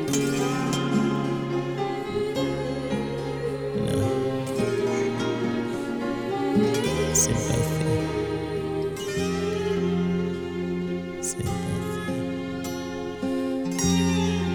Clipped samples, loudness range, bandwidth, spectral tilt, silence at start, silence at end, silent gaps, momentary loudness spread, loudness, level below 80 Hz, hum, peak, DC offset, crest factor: under 0.1%; 4 LU; over 20 kHz; -5 dB/octave; 0 s; 0 s; none; 7 LU; -26 LUFS; -46 dBFS; none; -8 dBFS; under 0.1%; 18 dB